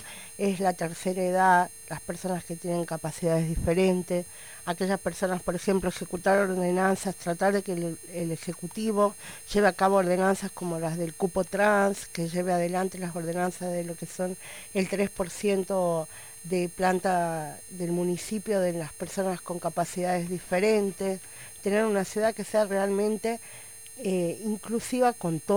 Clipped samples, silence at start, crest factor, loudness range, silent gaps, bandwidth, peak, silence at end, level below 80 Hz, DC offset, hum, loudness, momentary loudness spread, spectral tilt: under 0.1%; 0 s; 18 dB; 3 LU; none; over 20 kHz; -8 dBFS; 0 s; -52 dBFS; 0.2%; none; -28 LUFS; 10 LU; -5.5 dB/octave